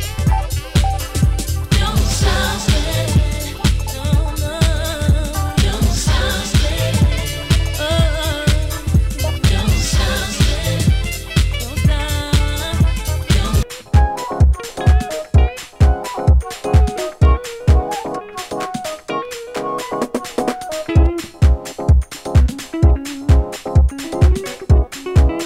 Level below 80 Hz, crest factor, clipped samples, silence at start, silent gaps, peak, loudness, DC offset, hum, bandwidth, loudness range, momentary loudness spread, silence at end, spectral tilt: -18 dBFS; 14 dB; under 0.1%; 0 s; none; 0 dBFS; -17 LUFS; under 0.1%; none; 16 kHz; 3 LU; 6 LU; 0 s; -5 dB/octave